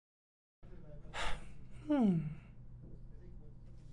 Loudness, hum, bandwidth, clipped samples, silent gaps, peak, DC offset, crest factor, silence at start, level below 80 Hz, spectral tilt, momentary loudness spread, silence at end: -37 LUFS; none; 11 kHz; under 0.1%; none; -22 dBFS; under 0.1%; 18 dB; 0.6 s; -52 dBFS; -7 dB/octave; 25 LU; 0 s